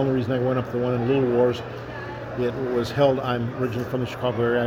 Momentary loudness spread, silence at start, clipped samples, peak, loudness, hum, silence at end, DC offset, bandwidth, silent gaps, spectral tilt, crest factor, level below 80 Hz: 11 LU; 0 s; under 0.1%; -6 dBFS; -24 LUFS; none; 0 s; under 0.1%; 16.5 kHz; none; -7.5 dB/octave; 18 dB; -50 dBFS